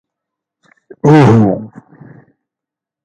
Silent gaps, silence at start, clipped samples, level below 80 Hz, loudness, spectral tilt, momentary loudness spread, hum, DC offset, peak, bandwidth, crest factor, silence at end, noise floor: none; 1.05 s; under 0.1%; -46 dBFS; -10 LUFS; -8.5 dB/octave; 17 LU; none; under 0.1%; 0 dBFS; 9.4 kHz; 14 dB; 1.4 s; -85 dBFS